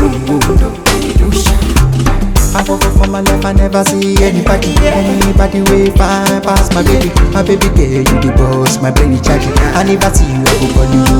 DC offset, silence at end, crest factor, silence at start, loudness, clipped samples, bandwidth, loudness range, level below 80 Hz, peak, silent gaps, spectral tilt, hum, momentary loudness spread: under 0.1%; 0 s; 8 dB; 0 s; -10 LUFS; under 0.1%; 19 kHz; 1 LU; -14 dBFS; 0 dBFS; none; -5 dB/octave; none; 2 LU